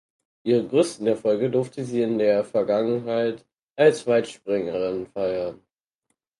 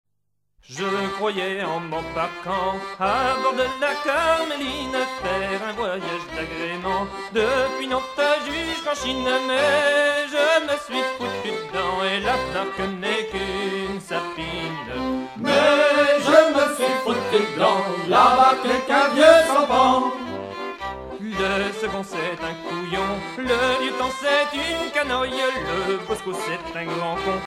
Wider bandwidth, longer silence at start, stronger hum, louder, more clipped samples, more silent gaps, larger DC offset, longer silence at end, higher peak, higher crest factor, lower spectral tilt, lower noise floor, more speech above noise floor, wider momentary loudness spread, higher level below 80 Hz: second, 11.5 kHz vs 16 kHz; second, 0.45 s vs 0.7 s; neither; about the same, -23 LUFS vs -21 LUFS; neither; first, 3.62-3.75 s vs none; neither; first, 0.85 s vs 0 s; second, -6 dBFS vs -2 dBFS; about the same, 18 dB vs 20 dB; first, -6 dB/octave vs -3.5 dB/octave; about the same, -76 dBFS vs -77 dBFS; about the same, 54 dB vs 56 dB; second, 8 LU vs 12 LU; second, -64 dBFS vs -48 dBFS